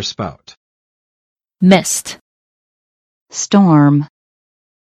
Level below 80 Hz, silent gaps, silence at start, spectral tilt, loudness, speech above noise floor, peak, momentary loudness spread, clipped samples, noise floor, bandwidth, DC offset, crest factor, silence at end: -54 dBFS; 0.57-1.36 s, 2.21-3.26 s; 0 s; -5 dB/octave; -13 LUFS; over 78 dB; 0 dBFS; 17 LU; under 0.1%; under -90 dBFS; 14 kHz; under 0.1%; 16 dB; 0.8 s